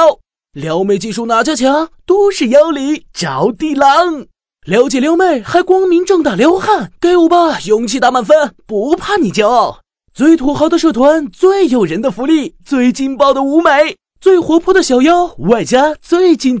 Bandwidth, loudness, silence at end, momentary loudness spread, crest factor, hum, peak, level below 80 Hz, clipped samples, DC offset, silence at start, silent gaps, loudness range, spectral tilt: 8 kHz; -11 LUFS; 0 s; 7 LU; 12 dB; none; 0 dBFS; -46 dBFS; 0.6%; under 0.1%; 0 s; none; 2 LU; -5 dB/octave